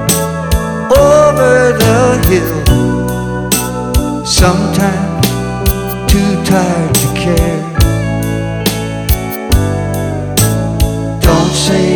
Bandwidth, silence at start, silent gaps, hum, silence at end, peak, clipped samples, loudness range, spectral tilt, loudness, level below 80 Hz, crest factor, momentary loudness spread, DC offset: over 20 kHz; 0 s; none; none; 0 s; 0 dBFS; under 0.1%; 4 LU; -5 dB/octave; -12 LUFS; -20 dBFS; 10 dB; 7 LU; under 0.1%